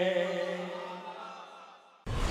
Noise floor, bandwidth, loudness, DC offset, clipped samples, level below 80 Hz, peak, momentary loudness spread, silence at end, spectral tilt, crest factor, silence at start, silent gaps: -54 dBFS; 13.5 kHz; -36 LUFS; under 0.1%; under 0.1%; -44 dBFS; -14 dBFS; 18 LU; 0 s; -5.5 dB/octave; 20 dB; 0 s; none